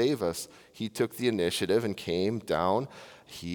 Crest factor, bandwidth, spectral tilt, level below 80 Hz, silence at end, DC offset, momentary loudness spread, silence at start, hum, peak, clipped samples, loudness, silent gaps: 18 dB; over 20 kHz; -5 dB/octave; -66 dBFS; 0 s; under 0.1%; 14 LU; 0 s; none; -12 dBFS; under 0.1%; -30 LUFS; none